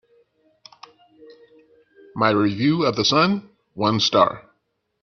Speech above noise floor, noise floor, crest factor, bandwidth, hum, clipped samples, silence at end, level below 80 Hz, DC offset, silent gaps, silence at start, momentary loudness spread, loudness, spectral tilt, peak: 53 dB; -72 dBFS; 20 dB; 7.2 kHz; none; under 0.1%; 0.65 s; -60 dBFS; under 0.1%; none; 2.15 s; 16 LU; -19 LUFS; -5 dB/octave; -2 dBFS